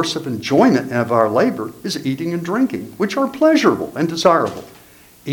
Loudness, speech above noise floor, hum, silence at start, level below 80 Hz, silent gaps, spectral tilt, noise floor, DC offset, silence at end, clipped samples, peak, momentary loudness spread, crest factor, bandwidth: -17 LUFS; 29 dB; none; 0 s; -58 dBFS; none; -5.5 dB/octave; -46 dBFS; under 0.1%; 0 s; under 0.1%; 0 dBFS; 10 LU; 18 dB; 19 kHz